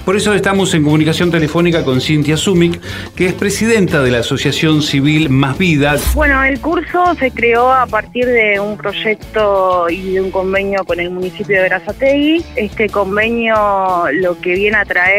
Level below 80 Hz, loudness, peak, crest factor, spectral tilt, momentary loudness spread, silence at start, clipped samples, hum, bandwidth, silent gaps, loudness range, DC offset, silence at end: -30 dBFS; -13 LUFS; 0 dBFS; 12 dB; -5.5 dB/octave; 5 LU; 0 s; under 0.1%; none; 16 kHz; none; 3 LU; under 0.1%; 0 s